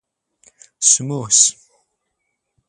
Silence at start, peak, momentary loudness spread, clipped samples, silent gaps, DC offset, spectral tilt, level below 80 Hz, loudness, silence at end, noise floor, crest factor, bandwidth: 0.8 s; 0 dBFS; 4 LU; under 0.1%; none; under 0.1%; -1.5 dB/octave; -66 dBFS; -14 LUFS; 1.15 s; -74 dBFS; 22 dB; 15.5 kHz